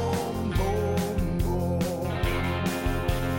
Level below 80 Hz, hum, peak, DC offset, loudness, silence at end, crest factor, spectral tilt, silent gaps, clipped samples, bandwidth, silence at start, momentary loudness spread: -34 dBFS; none; -14 dBFS; under 0.1%; -28 LUFS; 0 s; 12 dB; -6 dB/octave; none; under 0.1%; 17 kHz; 0 s; 2 LU